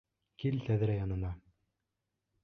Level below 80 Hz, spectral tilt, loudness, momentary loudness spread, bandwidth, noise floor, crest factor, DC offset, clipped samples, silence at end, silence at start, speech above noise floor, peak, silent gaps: -52 dBFS; -9.5 dB/octave; -35 LUFS; 9 LU; 6 kHz; -86 dBFS; 16 dB; under 0.1%; under 0.1%; 1.05 s; 0.4 s; 53 dB; -20 dBFS; none